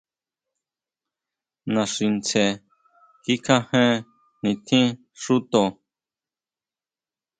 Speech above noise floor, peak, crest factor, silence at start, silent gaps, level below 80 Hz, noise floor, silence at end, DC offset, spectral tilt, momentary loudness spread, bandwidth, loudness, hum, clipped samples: over 69 dB; -2 dBFS; 22 dB; 1.65 s; none; -66 dBFS; under -90 dBFS; 1.7 s; under 0.1%; -4.5 dB/octave; 9 LU; 9.4 kHz; -22 LUFS; none; under 0.1%